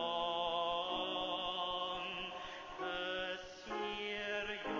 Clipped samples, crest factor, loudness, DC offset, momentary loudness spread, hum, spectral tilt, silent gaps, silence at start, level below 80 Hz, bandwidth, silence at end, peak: under 0.1%; 16 dB; -39 LUFS; under 0.1%; 8 LU; none; -3.5 dB/octave; none; 0 s; -66 dBFS; 7.6 kHz; 0 s; -24 dBFS